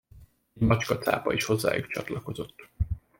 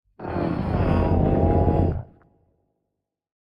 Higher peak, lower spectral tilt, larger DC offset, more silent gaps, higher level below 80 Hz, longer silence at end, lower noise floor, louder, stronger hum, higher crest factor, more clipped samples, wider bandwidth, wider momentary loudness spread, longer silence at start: about the same, -8 dBFS vs -8 dBFS; second, -5.5 dB/octave vs -11 dB/octave; neither; neither; second, -42 dBFS vs -34 dBFS; second, 0.2 s vs 1.4 s; second, -54 dBFS vs -81 dBFS; second, -28 LUFS vs -22 LUFS; neither; about the same, 20 dB vs 16 dB; neither; first, 17 kHz vs 5.4 kHz; first, 11 LU vs 8 LU; about the same, 0.15 s vs 0.2 s